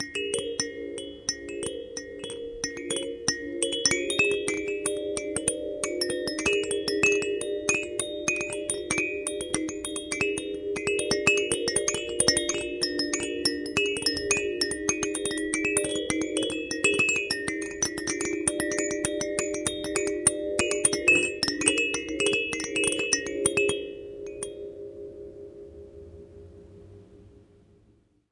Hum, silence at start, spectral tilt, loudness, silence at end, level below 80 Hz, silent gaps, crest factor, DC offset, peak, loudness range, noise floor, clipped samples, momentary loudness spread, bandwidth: none; 0 s; -2 dB/octave; -26 LUFS; 0.9 s; -56 dBFS; none; 24 dB; under 0.1%; -4 dBFS; 8 LU; -63 dBFS; under 0.1%; 14 LU; 11.5 kHz